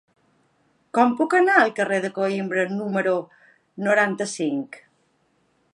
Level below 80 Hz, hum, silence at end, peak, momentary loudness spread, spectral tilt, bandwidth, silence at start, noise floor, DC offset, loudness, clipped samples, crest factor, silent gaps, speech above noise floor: -78 dBFS; none; 0.95 s; -4 dBFS; 10 LU; -5 dB/octave; 11.5 kHz; 0.95 s; -66 dBFS; under 0.1%; -22 LUFS; under 0.1%; 20 dB; none; 45 dB